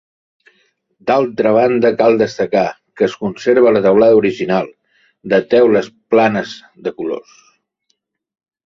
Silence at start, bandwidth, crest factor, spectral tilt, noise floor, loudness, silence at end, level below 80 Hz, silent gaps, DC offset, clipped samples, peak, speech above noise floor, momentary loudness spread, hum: 1.05 s; 7.4 kHz; 14 dB; -6.5 dB/octave; -68 dBFS; -14 LUFS; 1.45 s; -56 dBFS; none; under 0.1%; under 0.1%; 0 dBFS; 54 dB; 14 LU; none